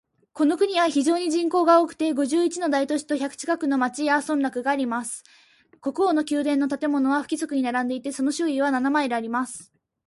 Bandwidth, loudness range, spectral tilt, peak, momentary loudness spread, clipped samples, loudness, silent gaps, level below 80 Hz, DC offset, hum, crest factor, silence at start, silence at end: 11.5 kHz; 3 LU; -3 dB/octave; -6 dBFS; 7 LU; under 0.1%; -23 LUFS; none; -72 dBFS; under 0.1%; none; 18 dB; 0.35 s; 0.45 s